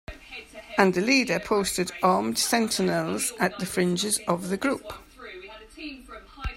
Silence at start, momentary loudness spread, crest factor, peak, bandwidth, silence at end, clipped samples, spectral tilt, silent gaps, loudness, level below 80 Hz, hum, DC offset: 0.1 s; 20 LU; 24 dB; -4 dBFS; 16 kHz; 0 s; under 0.1%; -3.5 dB/octave; none; -24 LUFS; -50 dBFS; none; under 0.1%